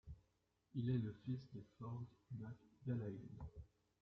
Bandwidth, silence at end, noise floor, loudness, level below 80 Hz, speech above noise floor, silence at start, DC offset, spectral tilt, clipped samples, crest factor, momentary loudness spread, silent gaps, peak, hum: 5.8 kHz; 0.35 s; -83 dBFS; -49 LUFS; -68 dBFS; 36 dB; 0.05 s; under 0.1%; -9.5 dB/octave; under 0.1%; 18 dB; 18 LU; none; -30 dBFS; none